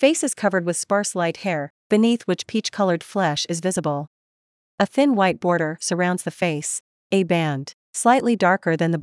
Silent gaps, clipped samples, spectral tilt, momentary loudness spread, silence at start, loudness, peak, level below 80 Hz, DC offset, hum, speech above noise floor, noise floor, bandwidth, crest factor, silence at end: 1.70-1.90 s, 4.07-4.78 s, 6.80-7.10 s, 7.74-7.93 s; under 0.1%; -4.5 dB/octave; 8 LU; 0 s; -21 LUFS; -4 dBFS; -72 dBFS; under 0.1%; none; over 69 dB; under -90 dBFS; 12 kHz; 18 dB; 0 s